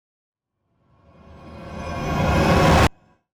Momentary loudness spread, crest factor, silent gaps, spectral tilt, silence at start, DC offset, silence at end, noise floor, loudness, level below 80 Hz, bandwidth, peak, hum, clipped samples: 20 LU; 14 dB; none; -6 dB/octave; 1.45 s; under 0.1%; 0.45 s; -71 dBFS; -19 LUFS; -32 dBFS; 19.5 kHz; -10 dBFS; none; under 0.1%